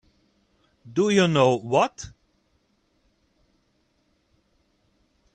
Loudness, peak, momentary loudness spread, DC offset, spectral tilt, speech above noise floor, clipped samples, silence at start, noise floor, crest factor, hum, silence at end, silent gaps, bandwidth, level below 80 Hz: -22 LUFS; -6 dBFS; 18 LU; under 0.1%; -5.5 dB/octave; 47 dB; under 0.1%; 0.85 s; -68 dBFS; 22 dB; none; 3.25 s; none; 9.8 kHz; -62 dBFS